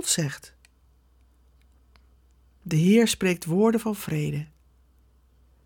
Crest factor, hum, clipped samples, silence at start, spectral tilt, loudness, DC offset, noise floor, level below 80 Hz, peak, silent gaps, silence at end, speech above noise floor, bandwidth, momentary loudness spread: 18 dB; none; under 0.1%; 0 s; -5 dB/octave; -24 LUFS; under 0.1%; -60 dBFS; -58 dBFS; -8 dBFS; none; 1.2 s; 37 dB; 19 kHz; 19 LU